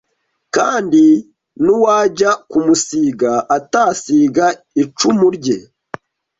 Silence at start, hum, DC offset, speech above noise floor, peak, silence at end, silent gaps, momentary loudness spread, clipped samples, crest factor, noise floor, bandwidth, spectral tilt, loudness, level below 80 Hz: 0.55 s; none; under 0.1%; 53 dB; -2 dBFS; 0.8 s; none; 9 LU; under 0.1%; 12 dB; -67 dBFS; 8 kHz; -4.5 dB/octave; -14 LUFS; -56 dBFS